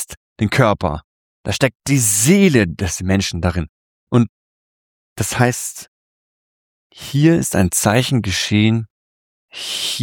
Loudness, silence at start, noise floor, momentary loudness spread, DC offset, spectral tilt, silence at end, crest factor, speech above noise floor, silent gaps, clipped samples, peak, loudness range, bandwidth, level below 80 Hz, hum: -17 LUFS; 0 s; under -90 dBFS; 16 LU; under 0.1%; -4.5 dB/octave; 0 s; 16 dB; over 74 dB; 0.17-0.36 s, 1.04-1.44 s, 1.75-1.80 s, 3.69-4.07 s, 4.29-5.16 s, 5.88-6.90 s, 8.90-9.48 s; under 0.1%; -2 dBFS; 6 LU; 19 kHz; -42 dBFS; none